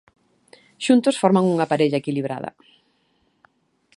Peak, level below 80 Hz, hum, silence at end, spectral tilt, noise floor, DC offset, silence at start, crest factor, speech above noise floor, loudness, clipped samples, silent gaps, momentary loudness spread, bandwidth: -2 dBFS; -70 dBFS; none; 1.5 s; -6 dB/octave; -66 dBFS; under 0.1%; 0.8 s; 20 dB; 46 dB; -20 LUFS; under 0.1%; none; 12 LU; 11.5 kHz